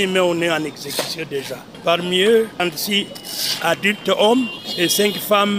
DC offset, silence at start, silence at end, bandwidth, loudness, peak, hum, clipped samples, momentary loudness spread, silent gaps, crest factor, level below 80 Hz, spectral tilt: under 0.1%; 0 s; 0 s; 16 kHz; -18 LUFS; -2 dBFS; none; under 0.1%; 9 LU; none; 18 dB; -64 dBFS; -3 dB/octave